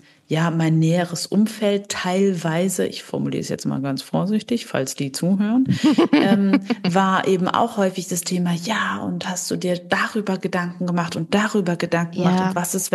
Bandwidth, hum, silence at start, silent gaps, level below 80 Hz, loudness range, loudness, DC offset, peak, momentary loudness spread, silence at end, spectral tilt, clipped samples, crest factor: 12.5 kHz; none; 0.3 s; none; -66 dBFS; 4 LU; -21 LUFS; under 0.1%; -2 dBFS; 7 LU; 0 s; -5.5 dB/octave; under 0.1%; 18 dB